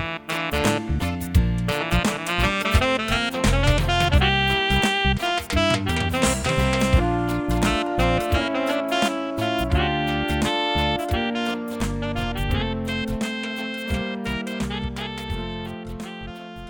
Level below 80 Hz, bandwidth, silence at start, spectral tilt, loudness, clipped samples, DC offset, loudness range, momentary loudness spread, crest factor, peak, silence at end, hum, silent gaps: -30 dBFS; 18 kHz; 0 s; -5 dB/octave; -23 LUFS; under 0.1%; under 0.1%; 7 LU; 9 LU; 18 dB; -4 dBFS; 0 s; none; none